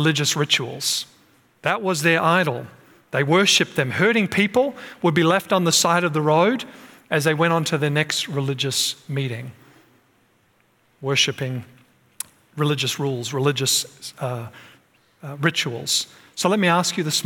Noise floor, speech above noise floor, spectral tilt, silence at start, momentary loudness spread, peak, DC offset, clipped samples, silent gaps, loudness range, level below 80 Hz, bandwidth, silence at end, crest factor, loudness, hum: -62 dBFS; 41 dB; -3.5 dB/octave; 0 s; 15 LU; -4 dBFS; under 0.1%; under 0.1%; none; 7 LU; -68 dBFS; 18 kHz; 0 s; 18 dB; -20 LUFS; none